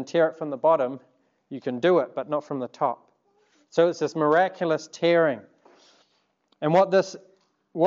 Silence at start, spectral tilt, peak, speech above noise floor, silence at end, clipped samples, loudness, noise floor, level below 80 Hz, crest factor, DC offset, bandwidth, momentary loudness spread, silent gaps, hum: 0 s; -6 dB/octave; -8 dBFS; 46 dB; 0 s; under 0.1%; -24 LUFS; -69 dBFS; -84 dBFS; 18 dB; under 0.1%; 7.6 kHz; 14 LU; none; none